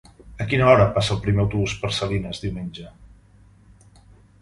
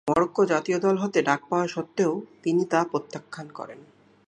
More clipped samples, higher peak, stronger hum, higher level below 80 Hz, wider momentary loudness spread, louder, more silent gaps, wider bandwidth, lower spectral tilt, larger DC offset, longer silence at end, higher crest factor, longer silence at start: neither; first, -2 dBFS vs -6 dBFS; neither; first, -40 dBFS vs -64 dBFS; about the same, 17 LU vs 16 LU; first, -21 LUFS vs -25 LUFS; neither; about the same, 11.5 kHz vs 10.5 kHz; about the same, -6 dB/octave vs -6 dB/octave; neither; first, 1.35 s vs 0.45 s; about the same, 22 dB vs 20 dB; first, 0.25 s vs 0.05 s